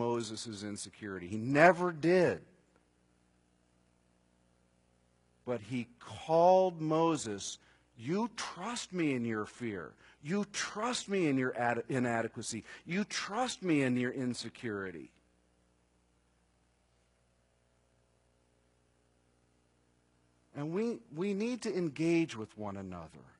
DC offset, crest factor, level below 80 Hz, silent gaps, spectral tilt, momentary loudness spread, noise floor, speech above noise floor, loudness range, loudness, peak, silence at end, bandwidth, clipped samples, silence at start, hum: under 0.1%; 26 dB; -74 dBFS; none; -5 dB/octave; 15 LU; -73 dBFS; 39 dB; 13 LU; -33 LUFS; -8 dBFS; 0.2 s; 11 kHz; under 0.1%; 0 s; 60 Hz at -65 dBFS